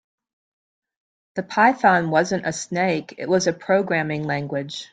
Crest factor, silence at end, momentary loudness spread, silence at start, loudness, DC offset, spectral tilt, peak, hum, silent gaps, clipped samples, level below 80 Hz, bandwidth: 20 dB; 0.05 s; 11 LU; 1.35 s; -21 LUFS; under 0.1%; -5 dB/octave; -4 dBFS; none; none; under 0.1%; -64 dBFS; 9.4 kHz